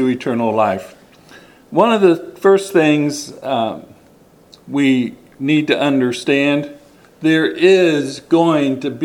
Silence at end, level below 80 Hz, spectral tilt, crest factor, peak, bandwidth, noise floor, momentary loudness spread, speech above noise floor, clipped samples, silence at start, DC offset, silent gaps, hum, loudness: 0 s; -62 dBFS; -5.5 dB/octave; 16 dB; 0 dBFS; 13.5 kHz; -48 dBFS; 11 LU; 33 dB; under 0.1%; 0 s; under 0.1%; none; none; -16 LUFS